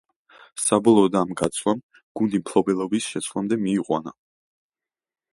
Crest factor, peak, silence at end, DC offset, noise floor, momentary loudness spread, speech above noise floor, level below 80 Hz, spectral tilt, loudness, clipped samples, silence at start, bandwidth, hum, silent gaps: 20 dB; -4 dBFS; 1.2 s; under 0.1%; under -90 dBFS; 11 LU; over 68 dB; -60 dBFS; -5 dB/octave; -22 LUFS; under 0.1%; 0.55 s; 11.5 kHz; none; 1.83-1.89 s, 2.03-2.15 s